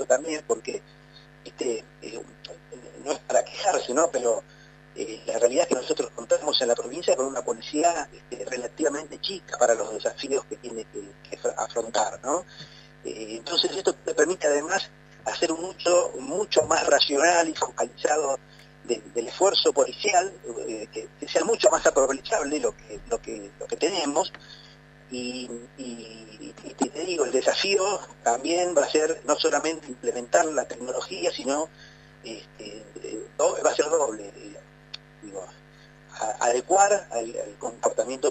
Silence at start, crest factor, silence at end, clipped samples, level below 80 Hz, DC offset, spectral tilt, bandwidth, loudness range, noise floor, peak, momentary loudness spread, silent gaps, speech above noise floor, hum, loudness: 0 s; 20 dB; 0 s; under 0.1%; -60 dBFS; under 0.1%; -2 dB/octave; 9.2 kHz; 7 LU; -51 dBFS; -6 dBFS; 19 LU; none; 25 dB; none; -25 LUFS